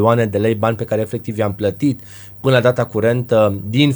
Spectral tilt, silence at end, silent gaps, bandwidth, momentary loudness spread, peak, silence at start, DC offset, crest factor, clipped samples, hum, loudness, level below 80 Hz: -7 dB/octave; 0 s; none; over 20 kHz; 7 LU; 0 dBFS; 0 s; under 0.1%; 16 dB; under 0.1%; none; -17 LUFS; -52 dBFS